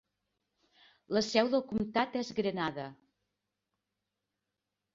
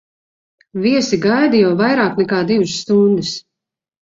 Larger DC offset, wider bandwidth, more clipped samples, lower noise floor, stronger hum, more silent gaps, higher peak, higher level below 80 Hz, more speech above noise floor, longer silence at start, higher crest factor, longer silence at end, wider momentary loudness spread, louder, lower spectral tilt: neither; about the same, 7.8 kHz vs 7.8 kHz; neither; first, -87 dBFS vs -83 dBFS; neither; neither; second, -12 dBFS vs -2 dBFS; second, -68 dBFS vs -56 dBFS; second, 55 dB vs 69 dB; first, 1.1 s vs 0.75 s; first, 24 dB vs 14 dB; first, 2 s vs 0.75 s; about the same, 8 LU vs 7 LU; second, -32 LUFS vs -15 LUFS; about the same, -5 dB/octave vs -5.5 dB/octave